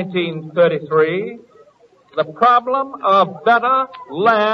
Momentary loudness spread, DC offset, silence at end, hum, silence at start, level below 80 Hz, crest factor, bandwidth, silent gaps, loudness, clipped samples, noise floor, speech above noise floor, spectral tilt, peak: 10 LU; under 0.1%; 0 s; none; 0 s; -64 dBFS; 16 dB; 6.4 kHz; none; -16 LUFS; under 0.1%; -51 dBFS; 35 dB; -7 dB/octave; 0 dBFS